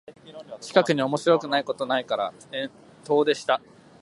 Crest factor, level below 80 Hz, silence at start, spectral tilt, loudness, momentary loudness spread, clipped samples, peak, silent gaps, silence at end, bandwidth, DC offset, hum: 22 dB; -72 dBFS; 0.1 s; -4.5 dB/octave; -24 LUFS; 16 LU; under 0.1%; -4 dBFS; none; 0.45 s; 11.5 kHz; under 0.1%; none